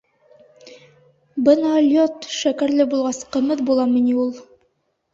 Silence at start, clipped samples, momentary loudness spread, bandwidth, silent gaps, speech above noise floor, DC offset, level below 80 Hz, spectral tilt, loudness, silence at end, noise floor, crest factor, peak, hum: 0.65 s; under 0.1%; 7 LU; 7.8 kHz; none; 50 dB; under 0.1%; -64 dBFS; -4 dB/octave; -19 LUFS; 0.7 s; -68 dBFS; 18 dB; -2 dBFS; none